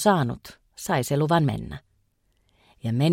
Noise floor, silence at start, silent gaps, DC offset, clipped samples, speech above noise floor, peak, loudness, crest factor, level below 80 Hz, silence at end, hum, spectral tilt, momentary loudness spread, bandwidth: -68 dBFS; 0 s; none; under 0.1%; under 0.1%; 45 dB; -6 dBFS; -25 LUFS; 18 dB; -52 dBFS; 0 s; none; -6 dB/octave; 18 LU; 16.5 kHz